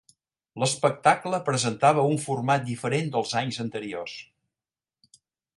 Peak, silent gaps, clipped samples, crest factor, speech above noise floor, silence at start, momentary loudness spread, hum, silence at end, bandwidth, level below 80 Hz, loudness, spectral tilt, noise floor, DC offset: -4 dBFS; none; under 0.1%; 24 dB; over 65 dB; 0.55 s; 13 LU; none; 1.35 s; 11.5 kHz; -68 dBFS; -25 LUFS; -4.5 dB/octave; under -90 dBFS; under 0.1%